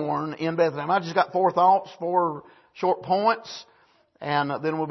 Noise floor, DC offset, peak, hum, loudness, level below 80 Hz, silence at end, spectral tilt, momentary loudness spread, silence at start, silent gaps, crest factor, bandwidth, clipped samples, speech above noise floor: -54 dBFS; under 0.1%; -6 dBFS; none; -24 LUFS; -72 dBFS; 0 s; -6.5 dB/octave; 10 LU; 0 s; none; 18 dB; 6.2 kHz; under 0.1%; 30 dB